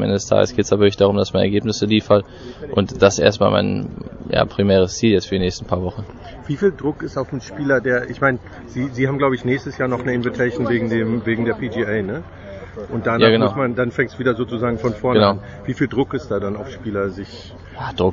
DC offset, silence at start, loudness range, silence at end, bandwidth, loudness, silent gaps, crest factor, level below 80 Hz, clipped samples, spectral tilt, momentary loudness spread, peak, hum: under 0.1%; 0 s; 4 LU; 0 s; 7.8 kHz; -19 LUFS; none; 18 dB; -44 dBFS; under 0.1%; -6 dB/octave; 14 LU; 0 dBFS; none